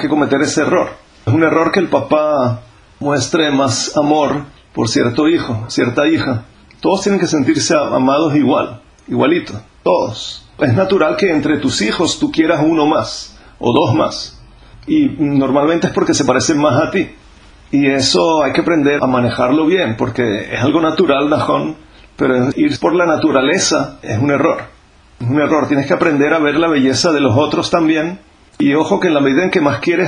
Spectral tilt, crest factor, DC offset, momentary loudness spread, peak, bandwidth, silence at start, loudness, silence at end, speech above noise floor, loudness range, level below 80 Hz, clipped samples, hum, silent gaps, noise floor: -5 dB/octave; 14 dB; under 0.1%; 8 LU; 0 dBFS; 10 kHz; 0 s; -14 LUFS; 0 s; 28 dB; 2 LU; -46 dBFS; under 0.1%; none; none; -42 dBFS